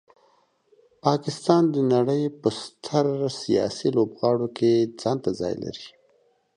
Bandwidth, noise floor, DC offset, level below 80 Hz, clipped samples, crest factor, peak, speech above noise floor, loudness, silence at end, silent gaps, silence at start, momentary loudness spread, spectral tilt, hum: 10.5 kHz; -64 dBFS; under 0.1%; -62 dBFS; under 0.1%; 20 dB; -4 dBFS; 41 dB; -24 LUFS; 0.7 s; none; 1.05 s; 9 LU; -6.5 dB/octave; none